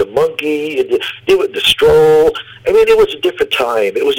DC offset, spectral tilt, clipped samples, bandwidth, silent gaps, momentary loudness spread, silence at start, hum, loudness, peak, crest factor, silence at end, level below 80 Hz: under 0.1%; -4 dB/octave; under 0.1%; 17 kHz; none; 8 LU; 0 s; none; -12 LUFS; 0 dBFS; 12 dB; 0 s; -42 dBFS